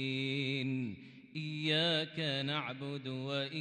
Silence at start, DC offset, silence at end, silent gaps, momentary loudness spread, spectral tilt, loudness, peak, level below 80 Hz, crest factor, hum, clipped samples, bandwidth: 0 s; under 0.1%; 0 s; none; 12 LU; -5.5 dB/octave; -35 LUFS; -20 dBFS; -82 dBFS; 16 dB; none; under 0.1%; 9.8 kHz